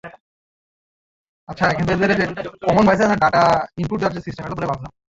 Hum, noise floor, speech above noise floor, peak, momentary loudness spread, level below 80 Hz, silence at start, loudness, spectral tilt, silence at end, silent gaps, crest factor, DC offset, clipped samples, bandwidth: none; under -90 dBFS; over 72 dB; -2 dBFS; 12 LU; -46 dBFS; 0.05 s; -18 LUFS; -6.5 dB/octave; 0.25 s; 0.20-1.47 s; 18 dB; under 0.1%; under 0.1%; 7.8 kHz